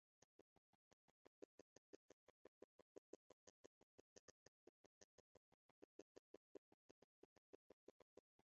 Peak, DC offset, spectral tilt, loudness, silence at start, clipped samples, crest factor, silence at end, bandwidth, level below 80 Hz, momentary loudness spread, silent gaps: -44 dBFS; under 0.1%; -4 dB/octave; -69 LUFS; 1.4 s; under 0.1%; 28 dB; 0.25 s; 7.4 kHz; under -90 dBFS; 2 LU; 1.45-8.17 s